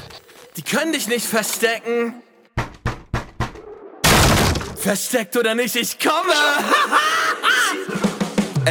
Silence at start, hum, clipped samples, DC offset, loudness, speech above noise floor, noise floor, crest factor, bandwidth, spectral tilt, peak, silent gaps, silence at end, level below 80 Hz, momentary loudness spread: 0 s; none; under 0.1%; under 0.1%; -19 LUFS; 23 dB; -42 dBFS; 18 dB; 19.5 kHz; -3.5 dB/octave; -2 dBFS; none; 0 s; -36 dBFS; 14 LU